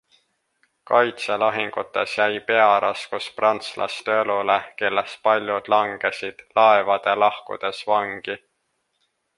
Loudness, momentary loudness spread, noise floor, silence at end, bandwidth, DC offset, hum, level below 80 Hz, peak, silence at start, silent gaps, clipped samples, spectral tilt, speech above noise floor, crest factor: -21 LUFS; 11 LU; -73 dBFS; 1 s; 11.5 kHz; under 0.1%; none; -68 dBFS; -2 dBFS; 0.9 s; none; under 0.1%; -3.5 dB/octave; 52 dB; 20 dB